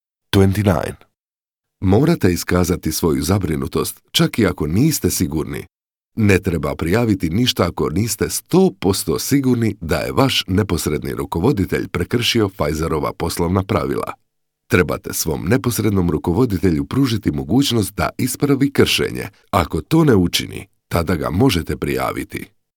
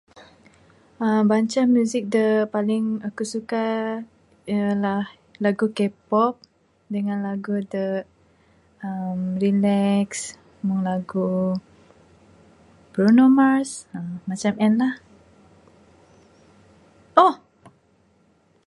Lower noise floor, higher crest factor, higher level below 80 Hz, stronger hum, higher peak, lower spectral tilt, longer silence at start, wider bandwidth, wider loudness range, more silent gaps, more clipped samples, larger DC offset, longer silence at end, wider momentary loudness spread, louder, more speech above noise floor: first, under -90 dBFS vs -61 dBFS; about the same, 18 dB vs 22 dB; first, -38 dBFS vs -64 dBFS; neither; about the same, 0 dBFS vs 0 dBFS; second, -5 dB/octave vs -6.5 dB/octave; first, 0.35 s vs 0.15 s; first, 19.5 kHz vs 11.5 kHz; second, 2 LU vs 6 LU; first, 1.20-1.28 s vs none; neither; neither; second, 0.3 s vs 1 s; second, 7 LU vs 14 LU; first, -18 LUFS vs -22 LUFS; first, over 73 dB vs 40 dB